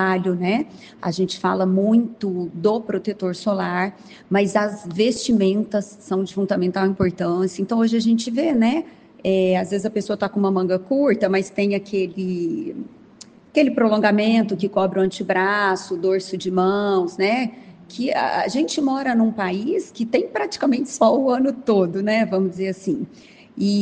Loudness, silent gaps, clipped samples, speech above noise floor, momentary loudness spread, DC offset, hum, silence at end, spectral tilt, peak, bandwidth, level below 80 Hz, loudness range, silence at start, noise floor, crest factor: -21 LUFS; none; under 0.1%; 26 dB; 8 LU; under 0.1%; none; 0 s; -6 dB/octave; -4 dBFS; 9.4 kHz; -60 dBFS; 2 LU; 0 s; -46 dBFS; 18 dB